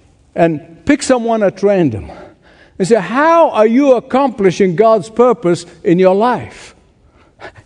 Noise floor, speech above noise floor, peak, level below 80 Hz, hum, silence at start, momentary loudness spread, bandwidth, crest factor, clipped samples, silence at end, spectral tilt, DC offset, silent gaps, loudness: -49 dBFS; 37 dB; 0 dBFS; -48 dBFS; none; 0.35 s; 11 LU; 10.5 kHz; 14 dB; under 0.1%; 0.15 s; -6 dB/octave; under 0.1%; none; -12 LUFS